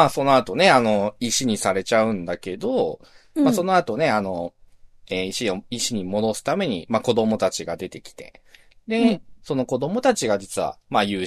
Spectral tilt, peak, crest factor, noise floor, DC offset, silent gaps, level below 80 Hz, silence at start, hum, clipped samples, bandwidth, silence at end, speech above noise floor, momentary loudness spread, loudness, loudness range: -4 dB/octave; -2 dBFS; 20 dB; -48 dBFS; under 0.1%; none; -56 dBFS; 0 s; none; under 0.1%; 13.5 kHz; 0 s; 26 dB; 12 LU; -22 LUFS; 4 LU